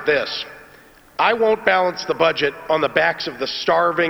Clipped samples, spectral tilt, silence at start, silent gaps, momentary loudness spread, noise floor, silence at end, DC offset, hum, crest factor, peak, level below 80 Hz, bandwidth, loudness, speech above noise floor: under 0.1%; -4 dB/octave; 0 s; none; 9 LU; -47 dBFS; 0 s; under 0.1%; none; 20 dB; 0 dBFS; -56 dBFS; over 20 kHz; -19 LUFS; 29 dB